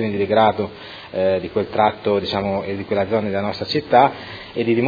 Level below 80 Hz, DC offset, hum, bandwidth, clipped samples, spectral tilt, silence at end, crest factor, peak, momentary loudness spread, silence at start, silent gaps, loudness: -54 dBFS; under 0.1%; none; 5 kHz; under 0.1%; -7.5 dB/octave; 0 s; 18 dB; 0 dBFS; 12 LU; 0 s; none; -20 LUFS